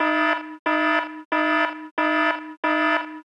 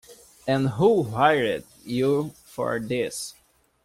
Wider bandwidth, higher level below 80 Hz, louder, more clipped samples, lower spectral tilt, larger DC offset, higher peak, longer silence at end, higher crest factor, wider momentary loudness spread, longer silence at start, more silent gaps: second, 9.2 kHz vs 16 kHz; second, -78 dBFS vs -58 dBFS; about the same, -22 LUFS vs -24 LUFS; neither; second, -3 dB/octave vs -5.5 dB/octave; neither; second, -10 dBFS vs -6 dBFS; second, 0.05 s vs 0.55 s; second, 12 dB vs 18 dB; second, 5 LU vs 14 LU; about the same, 0 s vs 0.1 s; first, 0.59-0.65 s, 1.25-1.31 s, 1.91-1.97 s, 2.57-2.63 s vs none